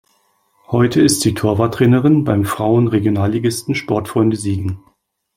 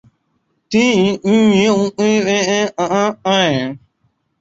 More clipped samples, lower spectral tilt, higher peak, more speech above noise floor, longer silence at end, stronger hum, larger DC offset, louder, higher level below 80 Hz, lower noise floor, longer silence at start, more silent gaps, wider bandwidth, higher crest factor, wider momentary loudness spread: neither; first, -6 dB/octave vs -4.5 dB/octave; about the same, 0 dBFS vs -2 dBFS; second, 46 dB vs 51 dB; about the same, 0.6 s vs 0.65 s; neither; neither; about the same, -16 LUFS vs -15 LUFS; first, -48 dBFS vs -54 dBFS; second, -60 dBFS vs -65 dBFS; about the same, 0.7 s vs 0.7 s; neither; first, 16.5 kHz vs 8 kHz; about the same, 16 dB vs 14 dB; about the same, 8 LU vs 6 LU